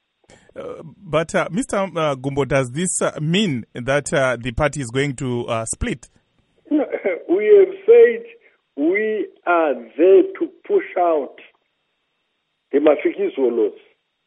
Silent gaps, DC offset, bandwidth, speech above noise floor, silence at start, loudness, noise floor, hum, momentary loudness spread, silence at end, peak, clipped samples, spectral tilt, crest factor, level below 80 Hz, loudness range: none; under 0.1%; 11.5 kHz; 53 dB; 0.55 s; -19 LUFS; -72 dBFS; none; 12 LU; 0.55 s; -2 dBFS; under 0.1%; -5 dB/octave; 18 dB; -46 dBFS; 5 LU